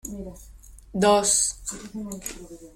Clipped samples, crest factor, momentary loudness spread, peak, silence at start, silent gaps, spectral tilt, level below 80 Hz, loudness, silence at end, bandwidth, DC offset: under 0.1%; 18 dB; 20 LU; -8 dBFS; 0.05 s; none; -2.5 dB/octave; -48 dBFS; -22 LUFS; 0.05 s; 16.5 kHz; under 0.1%